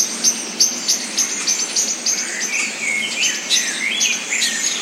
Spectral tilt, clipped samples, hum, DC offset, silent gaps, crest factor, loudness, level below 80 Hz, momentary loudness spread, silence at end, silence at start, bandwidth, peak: 1.5 dB/octave; under 0.1%; none; under 0.1%; none; 18 dB; -17 LUFS; under -90 dBFS; 3 LU; 0 s; 0 s; 16.5 kHz; -2 dBFS